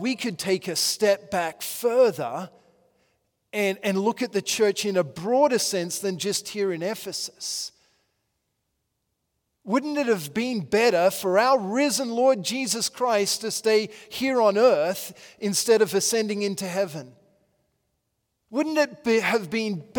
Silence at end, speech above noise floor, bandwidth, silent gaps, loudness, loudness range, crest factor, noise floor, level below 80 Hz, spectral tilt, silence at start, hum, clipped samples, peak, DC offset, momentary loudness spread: 0 s; 54 dB; 18 kHz; none; -24 LUFS; 8 LU; 18 dB; -77 dBFS; -72 dBFS; -3 dB/octave; 0 s; none; under 0.1%; -6 dBFS; under 0.1%; 10 LU